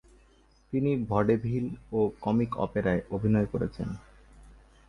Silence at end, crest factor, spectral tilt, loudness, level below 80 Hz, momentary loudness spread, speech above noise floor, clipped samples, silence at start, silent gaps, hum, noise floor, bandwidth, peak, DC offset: 0.35 s; 18 dB; -9.5 dB/octave; -29 LUFS; -50 dBFS; 8 LU; 33 dB; under 0.1%; 0.7 s; none; none; -61 dBFS; 10.5 kHz; -10 dBFS; under 0.1%